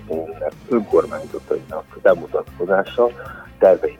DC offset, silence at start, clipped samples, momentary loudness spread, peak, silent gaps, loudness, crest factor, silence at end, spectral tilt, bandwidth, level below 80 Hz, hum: under 0.1%; 0 s; under 0.1%; 13 LU; -2 dBFS; none; -20 LUFS; 18 dB; 0.05 s; -7 dB/octave; 15.5 kHz; -48 dBFS; none